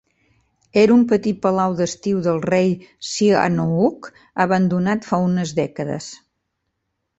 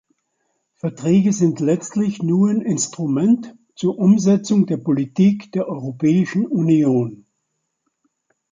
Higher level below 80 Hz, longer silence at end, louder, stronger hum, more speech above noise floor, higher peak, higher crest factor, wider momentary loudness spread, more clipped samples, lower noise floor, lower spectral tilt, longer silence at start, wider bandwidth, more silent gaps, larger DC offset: first, -56 dBFS vs -62 dBFS; second, 1.05 s vs 1.4 s; about the same, -19 LUFS vs -18 LUFS; neither; about the same, 57 dB vs 57 dB; about the same, -2 dBFS vs -4 dBFS; about the same, 18 dB vs 14 dB; first, 12 LU vs 9 LU; neither; about the same, -75 dBFS vs -74 dBFS; about the same, -6 dB/octave vs -7 dB/octave; about the same, 0.75 s vs 0.85 s; second, 8.2 kHz vs 9.4 kHz; neither; neither